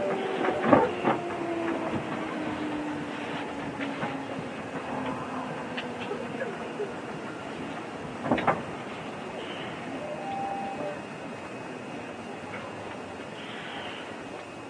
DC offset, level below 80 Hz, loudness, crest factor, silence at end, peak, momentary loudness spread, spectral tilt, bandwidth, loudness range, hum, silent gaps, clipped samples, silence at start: under 0.1%; -62 dBFS; -32 LUFS; 28 dB; 0 s; -4 dBFS; 11 LU; -5.5 dB/octave; 10.5 kHz; 8 LU; none; none; under 0.1%; 0 s